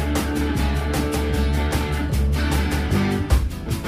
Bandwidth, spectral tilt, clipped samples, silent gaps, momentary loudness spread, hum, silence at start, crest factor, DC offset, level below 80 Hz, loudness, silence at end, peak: 16 kHz; -6 dB/octave; under 0.1%; none; 2 LU; none; 0 s; 16 dB; under 0.1%; -24 dBFS; -22 LUFS; 0 s; -6 dBFS